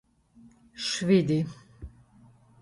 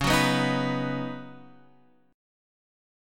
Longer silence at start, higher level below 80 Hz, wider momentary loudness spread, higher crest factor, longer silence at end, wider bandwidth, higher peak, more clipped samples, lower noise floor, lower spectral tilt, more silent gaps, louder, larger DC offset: first, 0.75 s vs 0 s; second, -56 dBFS vs -48 dBFS; first, 25 LU vs 18 LU; about the same, 20 dB vs 22 dB; second, 0.75 s vs 0.95 s; second, 11.5 kHz vs 17.5 kHz; about the same, -10 dBFS vs -8 dBFS; neither; second, -57 dBFS vs -61 dBFS; about the same, -5.5 dB/octave vs -4.5 dB/octave; neither; about the same, -26 LUFS vs -26 LUFS; neither